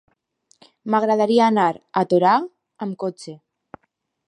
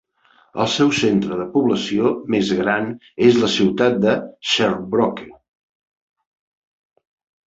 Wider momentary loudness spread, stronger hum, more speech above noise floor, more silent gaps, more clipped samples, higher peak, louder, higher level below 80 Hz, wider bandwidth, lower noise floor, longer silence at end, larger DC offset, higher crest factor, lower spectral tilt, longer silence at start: first, 20 LU vs 7 LU; neither; first, 53 dB vs 39 dB; neither; neither; about the same, -4 dBFS vs -2 dBFS; about the same, -19 LUFS vs -18 LUFS; second, -72 dBFS vs -56 dBFS; first, 10.5 kHz vs 8 kHz; first, -71 dBFS vs -57 dBFS; second, 0.95 s vs 2.15 s; neither; about the same, 18 dB vs 18 dB; first, -6.5 dB/octave vs -5 dB/octave; first, 0.85 s vs 0.55 s